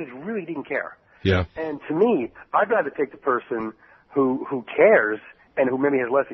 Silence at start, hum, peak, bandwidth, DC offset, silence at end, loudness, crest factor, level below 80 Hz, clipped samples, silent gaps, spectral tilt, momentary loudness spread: 0 s; none; -4 dBFS; 6 kHz; under 0.1%; 0 s; -23 LUFS; 18 dB; -52 dBFS; under 0.1%; none; -5 dB/octave; 12 LU